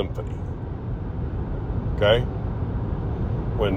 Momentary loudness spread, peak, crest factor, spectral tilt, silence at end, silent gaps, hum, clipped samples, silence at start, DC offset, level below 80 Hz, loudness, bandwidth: 11 LU; -6 dBFS; 18 dB; -8 dB/octave; 0 s; none; none; under 0.1%; 0 s; under 0.1%; -32 dBFS; -26 LUFS; 7 kHz